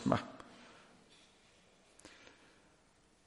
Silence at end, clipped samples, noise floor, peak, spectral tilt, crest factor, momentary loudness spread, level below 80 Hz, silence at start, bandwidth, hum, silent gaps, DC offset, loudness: 1.15 s; under 0.1%; -69 dBFS; -14 dBFS; -6.5 dB/octave; 32 dB; 24 LU; -70 dBFS; 0 s; 11.5 kHz; none; none; under 0.1%; -42 LUFS